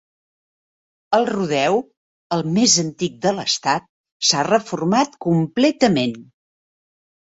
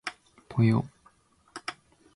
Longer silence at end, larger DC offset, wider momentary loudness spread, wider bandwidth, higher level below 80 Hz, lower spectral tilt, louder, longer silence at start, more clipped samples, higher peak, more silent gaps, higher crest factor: first, 1.15 s vs 0.45 s; neither; second, 9 LU vs 17 LU; second, 8 kHz vs 11.5 kHz; about the same, -62 dBFS vs -60 dBFS; second, -4 dB/octave vs -7.5 dB/octave; first, -19 LUFS vs -29 LUFS; first, 1.1 s vs 0.05 s; neither; first, -2 dBFS vs -12 dBFS; first, 1.97-2.30 s, 3.89-4.04 s, 4.12-4.20 s vs none; about the same, 20 dB vs 20 dB